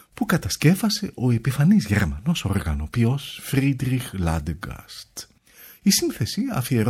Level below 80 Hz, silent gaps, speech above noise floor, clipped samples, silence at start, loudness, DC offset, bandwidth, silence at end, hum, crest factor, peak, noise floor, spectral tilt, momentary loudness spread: -38 dBFS; none; 27 dB; under 0.1%; 0.15 s; -22 LUFS; under 0.1%; 16.5 kHz; 0 s; none; 18 dB; -4 dBFS; -49 dBFS; -5 dB/octave; 14 LU